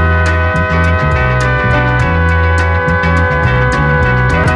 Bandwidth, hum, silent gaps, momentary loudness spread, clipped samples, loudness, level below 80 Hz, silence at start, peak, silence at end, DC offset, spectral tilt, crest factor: 10 kHz; none; none; 1 LU; under 0.1%; -11 LUFS; -18 dBFS; 0 s; -2 dBFS; 0 s; under 0.1%; -7 dB/octave; 8 dB